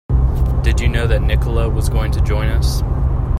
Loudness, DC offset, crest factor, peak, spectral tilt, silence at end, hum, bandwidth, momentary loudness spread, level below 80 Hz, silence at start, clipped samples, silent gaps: -17 LUFS; under 0.1%; 14 dB; -2 dBFS; -6.5 dB/octave; 0 s; none; 14 kHz; 2 LU; -16 dBFS; 0.1 s; under 0.1%; none